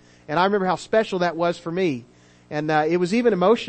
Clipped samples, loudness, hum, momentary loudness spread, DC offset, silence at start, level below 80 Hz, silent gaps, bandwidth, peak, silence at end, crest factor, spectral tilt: under 0.1%; -22 LUFS; 60 Hz at -50 dBFS; 8 LU; under 0.1%; 0.3 s; -60 dBFS; none; 8.8 kHz; -6 dBFS; 0 s; 16 dB; -6 dB/octave